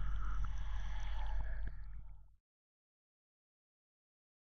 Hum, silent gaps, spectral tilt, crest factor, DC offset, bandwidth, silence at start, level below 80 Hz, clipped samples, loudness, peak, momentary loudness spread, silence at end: none; none; -5.5 dB/octave; 12 dB; under 0.1%; 6.4 kHz; 0 s; -44 dBFS; under 0.1%; -46 LUFS; -28 dBFS; 13 LU; 2.25 s